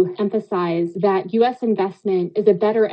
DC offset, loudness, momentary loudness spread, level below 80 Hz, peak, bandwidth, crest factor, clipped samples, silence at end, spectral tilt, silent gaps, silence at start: under 0.1%; -20 LUFS; 5 LU; -70 dBFS; -2 dBFS; 5.6 kHz; 16 dB; under 0.1%; 0 s; -9 dB/octave; none; 0 s